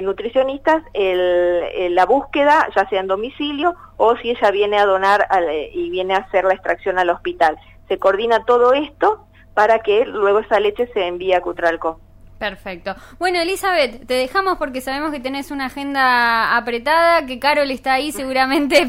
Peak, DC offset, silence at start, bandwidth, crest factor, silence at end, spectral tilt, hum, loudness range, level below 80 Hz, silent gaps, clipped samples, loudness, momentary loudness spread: 0 dBFS; under 0.1%; 0 s; 16 kHz; 16 dB; 0 s; -3.5 dB/octave; none; 4 LU; -46 dBFS; none; under 0.1%; -17 LUFS; 9 LU